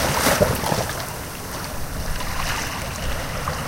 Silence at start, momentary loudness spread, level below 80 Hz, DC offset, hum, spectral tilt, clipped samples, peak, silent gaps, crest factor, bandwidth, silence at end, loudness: 0 s; 11 LU; -32 dBFS; under 0.1%; none; -3.5 dB/octave; under 0.1%; -4 dBFS; none; 20 dB; 17 kHz; 0 s; -24 LUFS